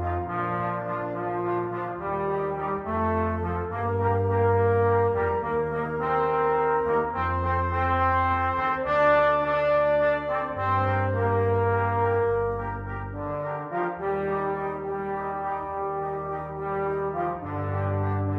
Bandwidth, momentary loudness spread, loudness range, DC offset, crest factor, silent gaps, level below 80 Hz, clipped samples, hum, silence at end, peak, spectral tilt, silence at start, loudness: 5.4 kHz; 9 LU; 6 LU; under 0.1%; 14 dB; none; -46 dBFS; under 0.1%; none; 0 s; -12 dBFS; -9 dB/octave; 0 s; -26 LUFS